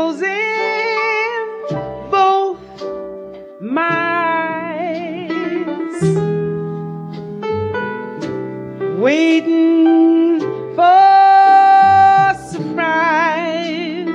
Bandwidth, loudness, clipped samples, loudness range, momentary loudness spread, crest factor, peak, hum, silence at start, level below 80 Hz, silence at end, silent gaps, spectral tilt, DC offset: 10 kHz; -15 LUFS; under 0.1%; 10 LU; 17 LU; 12 dB; -2 dBFS; none; 0 s; -56 dBFS; 0 s; none; -6.5 dB/octave; under 0.1%